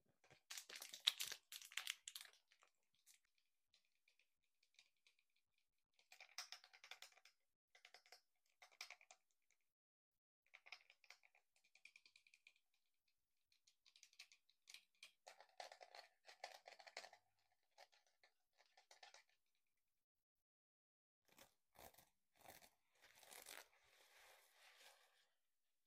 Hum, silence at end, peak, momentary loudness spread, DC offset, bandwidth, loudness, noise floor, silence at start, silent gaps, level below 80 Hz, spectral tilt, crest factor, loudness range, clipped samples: none; 0.65 s; -16 dBFS; 18 LU; under 0.1%; 15.5 kHz; -53 LUFS; under -90 dBFS; 0.25 s; 7.55-7.68 s, 9.72-10.12 s, 10.18-10.43 s, 20.04-20.15 s, 20.23-20.36 s, 20.42-21.22 s; under -90 dBFS; 2 dB/octave; 46 dB; 19 LU; under 0.1%